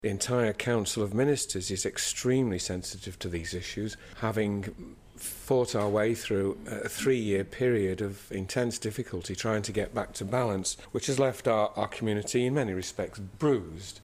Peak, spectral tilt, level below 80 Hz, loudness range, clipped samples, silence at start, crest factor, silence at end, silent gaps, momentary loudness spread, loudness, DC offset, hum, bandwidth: -12 dBFS; -4.5 dB/octave; -56 dBFS; 3 LU; under 0.1%; 0 s; 18 dB; 0 s; none; 9 LU; -30 LUFS; under 0.1%; none; 15.5 kHz